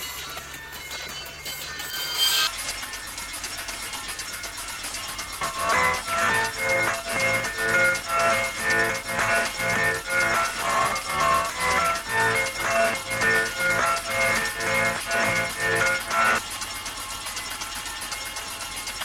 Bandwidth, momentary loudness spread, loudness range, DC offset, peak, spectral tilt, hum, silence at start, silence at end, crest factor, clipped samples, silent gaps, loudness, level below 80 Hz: 20 kHz; 10 LU; 4 LU; under 0.1%; -10 dBFS; -1.5 dB/octave; none; 0 s; 0 s; 16 dB; under 0.1%; none; -24 LUFS; -50 dBFS